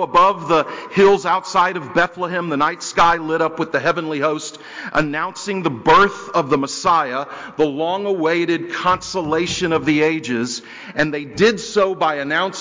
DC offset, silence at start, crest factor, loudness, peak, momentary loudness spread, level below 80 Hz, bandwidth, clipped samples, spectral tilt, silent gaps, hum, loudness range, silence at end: under 0.1%; 0 s; 14 dB; -18 LUFS; -4 dBFS; 8 LU; -50 dBFS; 7.6 kHz; under 0.1%; -4.5 dB/octave; none; none; 2 LU; 0 s